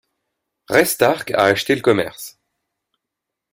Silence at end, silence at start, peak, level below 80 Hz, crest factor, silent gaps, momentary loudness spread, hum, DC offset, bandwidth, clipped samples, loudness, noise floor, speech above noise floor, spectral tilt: 1.2 s; 0.7 s; 0 dBFS; -58 dBFS; 20 dB; none; 13 LU; none; under 0.1%; 16.5 kHz; under 0.1%; -17 LUFS; -82 dBFS; 65 dB; -4 dB/octave